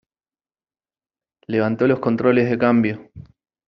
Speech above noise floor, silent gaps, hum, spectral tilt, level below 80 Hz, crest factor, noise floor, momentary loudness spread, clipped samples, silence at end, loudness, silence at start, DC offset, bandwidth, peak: over 72 dB; none; none; -6.5 dB/octave; -58 dBFS; 18 dB; under -90 dBFS; 7 LU; under 0.1%; 0.45 s; -19 LUFS; 1.5 s; under 0.1%; 6 kHz; -2 dBFS